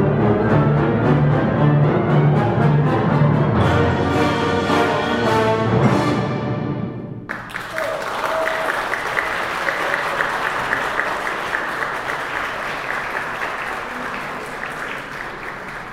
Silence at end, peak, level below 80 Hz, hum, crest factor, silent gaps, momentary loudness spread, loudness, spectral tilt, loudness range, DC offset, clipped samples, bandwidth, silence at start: 0 s; -2 dBFS; -42 dBFS; none; 18 dB; none; 11 LU; -19 LUFS; -7 dB/octave; 8 LU; under 0.1%; under 0.1%; 14.5 kHz; 0 s